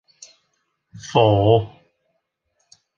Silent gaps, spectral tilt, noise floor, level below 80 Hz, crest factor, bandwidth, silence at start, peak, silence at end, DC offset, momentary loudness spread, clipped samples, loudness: none; -6.5 dB/octave; -73 dBFS; -48 dBFS; 20 dB; 7.6 kHz; 0.95 s; -2 dBFS; 1.3 s; under 0.1%; 21 LU; under 0.1%; -17 LUFS